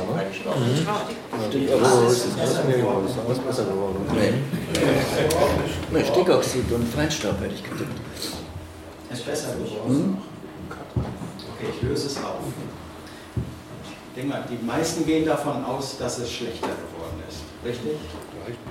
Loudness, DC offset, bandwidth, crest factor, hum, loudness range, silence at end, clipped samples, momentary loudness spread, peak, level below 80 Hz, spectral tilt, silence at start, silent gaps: -24 LUFS; under 0.1%; 16.5 kHz; 20 dB; none; 9 LU; 0 s; under 0.1%; 16 LU; -4 dBFS; -46 dBFS; -5 dB/octave; 0 s; none